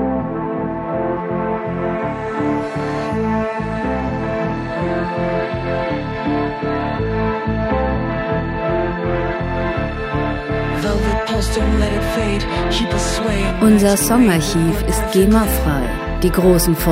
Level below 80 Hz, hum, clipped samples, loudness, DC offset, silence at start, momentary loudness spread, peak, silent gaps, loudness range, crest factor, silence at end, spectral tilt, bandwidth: -26 dBFS; none; under 0.1%; -18 LUFS; under 0.1%; 0 s; 8 LU; 0 dBFS; none; 6 LU; 16 dB; 0 s; -5.5 dB/octave; 16 kHz